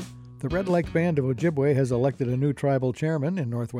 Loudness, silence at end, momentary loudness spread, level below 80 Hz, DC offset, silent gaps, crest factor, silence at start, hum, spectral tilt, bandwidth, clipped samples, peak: -25 LUFS; 0 s; 6 LU; -50 dBFS; under 0.1%; none; 14 dB; 0 s; none; -8 dB/octave; 11.5 kHz; under 0.1%; -12 dBFS